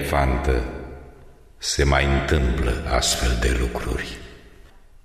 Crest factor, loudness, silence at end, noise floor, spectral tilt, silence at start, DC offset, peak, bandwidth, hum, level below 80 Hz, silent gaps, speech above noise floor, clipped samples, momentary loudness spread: 18 dB; -22 LUFS; 0.25 s; -47 dBFS; -4.5 dB/octave; 0 s; 0.1%; -4 dBFS; 15 kHz; none; -26 dBFS; none; 26 dB; under 0.1%; 15 LU